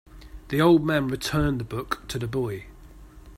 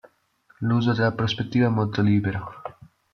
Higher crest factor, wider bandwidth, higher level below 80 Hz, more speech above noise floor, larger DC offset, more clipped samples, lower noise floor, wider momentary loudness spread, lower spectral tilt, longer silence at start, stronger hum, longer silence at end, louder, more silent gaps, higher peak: about the same, 20 dB vs 16 dB; first, 16 kHz vs 6.6 kHz; first, -42 dBFS vs -58 dBFS; second, 22 dB vs 39 dB; neither; neither; second, -46 dBFS vs -61 dBFS; second, 12 LU vs 15 LU; second, -6 dB/octave vs -7.5 dB/octave; second, 0.15 s vs 0.6 s; neither; second, 0 s vs 0.45 s; about the same, -25 LUFS vs -23 LUFS; neither; about the same, -6 dBFS vs -8 dBFS